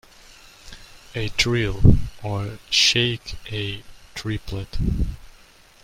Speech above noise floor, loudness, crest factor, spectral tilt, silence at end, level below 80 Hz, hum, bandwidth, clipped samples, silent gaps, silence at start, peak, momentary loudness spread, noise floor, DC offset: 29 dB; -22 LUFS; 22 dB; -4 dB/octave; 0.55 s; -32 dBFS; none; 16 kHz; under 0.1%; none; 0.65 s; 0 dBFS; 20 LU; -50 dBFS; under 0.1%